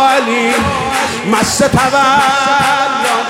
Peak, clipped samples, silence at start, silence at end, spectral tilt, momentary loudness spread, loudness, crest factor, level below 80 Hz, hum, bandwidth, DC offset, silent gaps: 0 dBFS; under 0.1%; 0 s; 0 s; -3.5 dB/octave; 5 LU; -11 LUFS; 12 dB; -38 dBFS; none; 16.5 kHz; under 0.1%; none